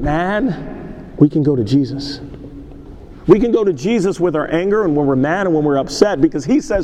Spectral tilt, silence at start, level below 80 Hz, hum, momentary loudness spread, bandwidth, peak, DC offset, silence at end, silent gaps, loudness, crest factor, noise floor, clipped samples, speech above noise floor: -7 dB/octave; 0 s; -36 dBFS; none; 17 LU; 10 kHz; 0 dBFS; under 0.1%; 0 s; none; -16 LUFS; 16 dB; -35 dBFS; under 0.1%; 20 dB